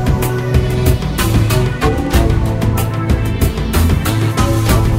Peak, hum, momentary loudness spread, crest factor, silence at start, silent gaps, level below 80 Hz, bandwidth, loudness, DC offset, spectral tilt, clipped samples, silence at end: 0 dBFS; none; 3 LU; 12 dB; 0 s; none; -18 dBFS; 16.5 kHz; -15 LUFS; under 0.1%; -6 dB/octave; under 0.1%; 0 s